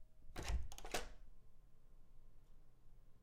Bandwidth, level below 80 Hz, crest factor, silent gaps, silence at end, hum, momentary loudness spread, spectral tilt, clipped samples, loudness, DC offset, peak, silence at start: 16 kHz; -52 dBFS; 22 dB; none; 0 s; none; 13 LU; -3.5 dB/octave; under 0.1%; -49 LUFS; under 0.1%; -28 dBFS; 0 s